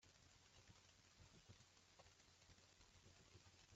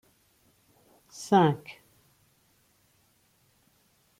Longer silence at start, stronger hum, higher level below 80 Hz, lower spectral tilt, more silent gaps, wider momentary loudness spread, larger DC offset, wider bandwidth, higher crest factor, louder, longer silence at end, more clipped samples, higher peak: second, 0 s vs 1.2 s; neither; second, -82 dBFS vs -74 dBFS; second, -3 dB/octave vs -6.5 dB/octave; neither; second, 1 LU vs 27 LU; neither; second, 8 kHz vs 16 kHz; about the same, 18 dB vs 22 dB; second, -69 LUFS vs -25 LUFS; second, 0 s vs 2.5 s; neither; second, -52 dBFS vs -10 dBFS